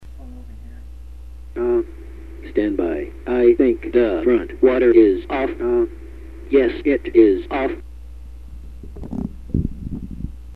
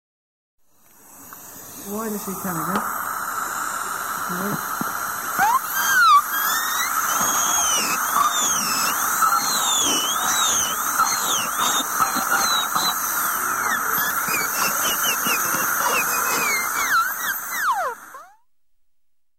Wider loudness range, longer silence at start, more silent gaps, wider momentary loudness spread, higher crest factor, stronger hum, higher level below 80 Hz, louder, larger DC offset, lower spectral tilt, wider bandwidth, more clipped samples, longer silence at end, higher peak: about the same, 7 LU vs 8 LU; second, 0 s vs 1.1 s; neither; first, 25 LU vs 8 LU; about the same, 18 dB vs 16 dB; neither; first, -36 dBFS vs -60 dBFS; about the same, -18 LUFS vs -20 LUFS; first, 0.9% vs 0.1%; first, -9 dB/octave vs 0 dB/octave; second, 4.5 kHz vs 16.5 kHz; neither; second, 0 s vs 1.15 s; first, 0 dBFS vs -6 dBFS